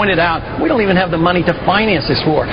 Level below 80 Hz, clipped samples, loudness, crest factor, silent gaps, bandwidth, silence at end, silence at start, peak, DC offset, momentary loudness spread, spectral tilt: -32 dBFS; under 0.1%; -14 LUFS; 14 dB; none; 5.4 kHz; 0 s; 0 s; 0 dBFS; under 0.1%; 3 LU; -8.5 dB/octave